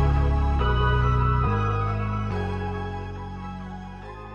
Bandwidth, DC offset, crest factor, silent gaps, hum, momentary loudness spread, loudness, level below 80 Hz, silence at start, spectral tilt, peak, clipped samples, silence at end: 6.8 kHz; under 0.1%; 14 dB; none; none; 15 LU; -25 LUFS; -28 dBFS; 0 s; -8 dB/octave; -10 dBFS; under 0.1%; 0 s